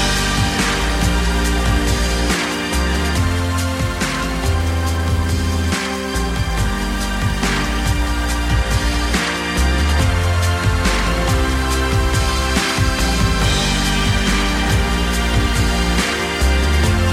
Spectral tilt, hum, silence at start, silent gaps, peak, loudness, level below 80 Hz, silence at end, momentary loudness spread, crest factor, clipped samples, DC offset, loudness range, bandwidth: -4.5 dB/octave; none; 0 s; none; -4 dBFS; -18 LUFS; -20 dBFS; 0 s; 3 LU; 14 dB; under 0.1%; under 0.1%; 3 LU; 16 kHz